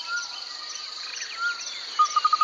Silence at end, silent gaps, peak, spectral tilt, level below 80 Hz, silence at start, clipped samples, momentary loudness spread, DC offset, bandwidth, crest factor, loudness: 0 s; none; -10 dBFS; 3.5 dB/octave; -84 dBFS; 0 s; under 0.1%; 11 LU; under 0.1%; 8 kHz; 16 dB; -27 LUFS